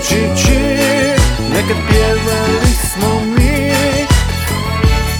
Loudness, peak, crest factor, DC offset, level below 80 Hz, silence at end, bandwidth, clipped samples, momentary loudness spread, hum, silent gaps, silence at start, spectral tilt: -13 LUFS; 0 dBFS; 12 dB; under 0.1%; -18 dBFS; 0 s; over 20 kHz; under 0.1%; 3 LU; none; none; 0 s; -4.5 dB/octave